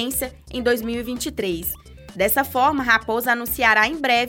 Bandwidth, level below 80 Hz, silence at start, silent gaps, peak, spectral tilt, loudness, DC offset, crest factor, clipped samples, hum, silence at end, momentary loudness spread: 17 kHz; -44 dBFS; 0 s; none; -4 dBFS; -3 dB/octave; -20 LUFS; under 0.1%; 18 dB; under 0.1%; none; 0 s; 10 LU